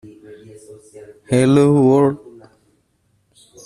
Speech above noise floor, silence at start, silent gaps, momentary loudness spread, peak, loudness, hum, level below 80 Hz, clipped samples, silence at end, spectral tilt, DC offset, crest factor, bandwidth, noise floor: 48 dB; 0.3 s; none; 8 LU; -2 dBFS; -14 LUFS; none; -54 dBFS; under 0.1%; 1.35 s; -7.5 dB/octave; under 0.1%; 16 dB; 12 kHz; -63 dBFS